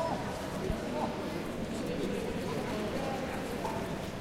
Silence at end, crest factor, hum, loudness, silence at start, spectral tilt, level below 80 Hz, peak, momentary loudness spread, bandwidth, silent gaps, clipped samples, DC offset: 0 s; 16 dB; none; -36 LUFS; 0 s; -5.5 dB/octave; -48 dBFS; -20 dBFS; 2 LU; 16 kHz; none; under 0.1%; under 0.1%